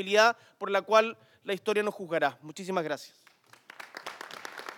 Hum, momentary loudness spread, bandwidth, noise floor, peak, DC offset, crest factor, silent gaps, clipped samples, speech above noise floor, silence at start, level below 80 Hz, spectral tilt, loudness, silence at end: none; 18 LU; 18 kHz; -55 dBFS; -8 dBFS; under 0.1%; 22 dB; none; under 0.1%; 27 dB; 0 s; under -90 dBFS; -3.5 dB/octave; -29 LUFS; 0 s